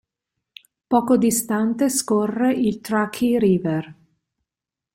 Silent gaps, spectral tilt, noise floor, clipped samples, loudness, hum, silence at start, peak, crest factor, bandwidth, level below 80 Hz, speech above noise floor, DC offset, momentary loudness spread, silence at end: none; -5 dB/octave; -88 dBFS; under 0.1%; -20 LUFS; none; 0.9 s; -4 dBFS; 18 dB; 16.5 kHz; -60 dBFS; 69 dB; under 0.1%; 5 LU; 1 s